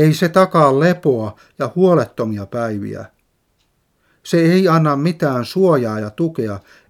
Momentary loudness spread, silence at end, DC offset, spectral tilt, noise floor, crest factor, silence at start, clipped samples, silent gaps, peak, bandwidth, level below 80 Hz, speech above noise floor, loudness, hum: 13 LU; 0.3 s; under 0.1%; -7 dB/octave; -64 dBFS; 16 dB; 0 s; under 0.1%; none; 0 dBFS; 15.5 kHz; -60 dBFS; 48 dB; -16 LUFS; none